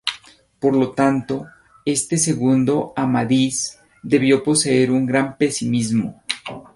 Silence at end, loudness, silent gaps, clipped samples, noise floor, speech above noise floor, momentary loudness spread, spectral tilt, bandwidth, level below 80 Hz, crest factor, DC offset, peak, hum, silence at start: 0.15 s; -19 LUFS; none; under 0.1%; -46 dBFS; 28 dB; 11 LU; -4.5 dB/octave; 11.5 kHz; -56 dBFS; 16 dB; under 0.1%; -2 dBFS; none; 0.05 s